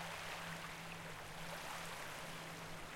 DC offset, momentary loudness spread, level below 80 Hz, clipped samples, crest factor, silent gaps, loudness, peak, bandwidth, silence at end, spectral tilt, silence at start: under 0.1%; 3 LU; -64 dBFS; under 0.1%; 14 dB; none; -48 LUFS; -34 dBFS; 16.5 kHz; 0 s; -3 dB/octave; 0 s